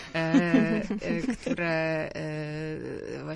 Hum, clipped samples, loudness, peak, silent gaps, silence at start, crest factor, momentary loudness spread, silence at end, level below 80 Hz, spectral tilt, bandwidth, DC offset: none; under 0.1%; -28 LUFS; -10 dBFS; none; 0 s; 18 dB; 12 LU; 0 s; -54 dBFS; -6.5 dB/octave; 11 kHz; under 0.1%